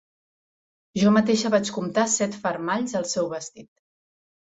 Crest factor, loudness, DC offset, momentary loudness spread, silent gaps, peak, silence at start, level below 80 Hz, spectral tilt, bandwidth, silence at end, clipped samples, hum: 20 dB; -23 LUFS; under 0.1%; 11 LU; none; -6 dBFS; 0.95 s; -64 dBFS; -4 dB/octave; 8 kHz; 0.95 s; under 0.1%; none